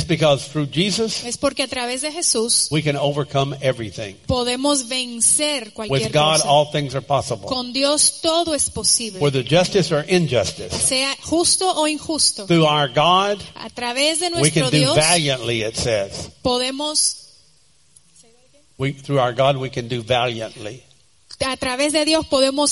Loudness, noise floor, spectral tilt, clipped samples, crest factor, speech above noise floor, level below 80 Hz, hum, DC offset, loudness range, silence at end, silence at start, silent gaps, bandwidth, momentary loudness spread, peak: -18 LUFS; -57 dBFS; -3 dB/octave; under 0.1%; 18 dB; 38 dB; -48 dBFS; none; 0.1%; 6 LU; 0 s; 0 s; none; 11.5 kHz; 9 LU; -2 dBFS